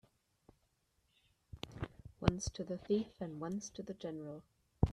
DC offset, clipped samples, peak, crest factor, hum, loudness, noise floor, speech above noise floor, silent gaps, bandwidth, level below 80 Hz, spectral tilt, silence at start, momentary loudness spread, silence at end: under 0.1%; under 0.1%; -12 dBFS; 30 dB; none; -41 LUFS; -79 dBFS; 37 dB; none; 13 kHz; -54 dBFS; -6 dB/octave; 1.55 s; 14 LU; 0 s